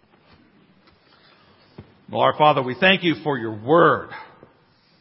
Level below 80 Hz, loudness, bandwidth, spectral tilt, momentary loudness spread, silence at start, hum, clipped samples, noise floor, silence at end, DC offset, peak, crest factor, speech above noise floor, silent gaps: -60 dBFS; -19 LUFS; 5.8 kHz; -10 dB/octave; 13 LU; 1.8 s; none; under 0.1%; -58 dBFS; 0.75 s; under 0.1%; 0 dBFS; 22 dB; 39 dB; none